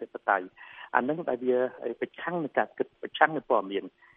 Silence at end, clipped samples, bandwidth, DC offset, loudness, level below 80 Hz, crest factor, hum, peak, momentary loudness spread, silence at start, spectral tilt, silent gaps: 0.3 s; under 0.1%; 3.8 kHz; under 0.1%; -29 LUFS; -76 dBFS; 24 dB; none; -6 dBFS; 10 LU; 0 s; -8.5 dB/octave; none